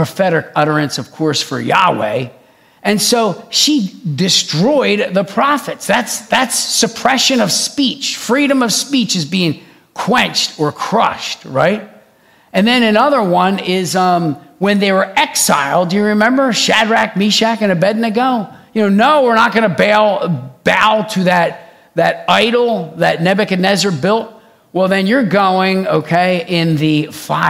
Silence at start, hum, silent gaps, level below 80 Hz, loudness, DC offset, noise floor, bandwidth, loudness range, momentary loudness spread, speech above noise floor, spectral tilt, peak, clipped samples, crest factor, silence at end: 0 s; none; none; -58 dBFS; -13 LUFS; under 0.1%; -49 dBFS; 16.5 kHz; 2 LU; 7 LU; 36 dB; -4 dB/octave; 0 dBFS; 0.1%; 14 dB; 0 s